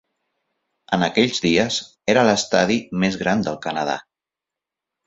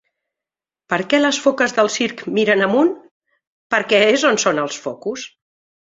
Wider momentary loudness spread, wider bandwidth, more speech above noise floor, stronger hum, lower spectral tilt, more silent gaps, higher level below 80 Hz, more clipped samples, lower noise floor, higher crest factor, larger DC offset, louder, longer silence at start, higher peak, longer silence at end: second, 8 LU vs 13 LU; about the same, 8 kHz vs 7.8 kHz; second, 68 dB vs 72 dB; neither; first, -4.5 dB/octave vs -3 dB/octave; second, none vs 3.11-3.21 s, 3.47-3.70 s; first, -54 dBFS vs -64 dBFS; neither; about the same, -87 dBFS vs -89 dBFS; about the same, 20 dB vs 18 dB; neither; second, -20 LUFS vs -17 LUFS; about the same, 0.9 s vs 0.9 s; about the same, -2 dBFS vs -2 dBFS; first, 1.05 s vs 0.6 s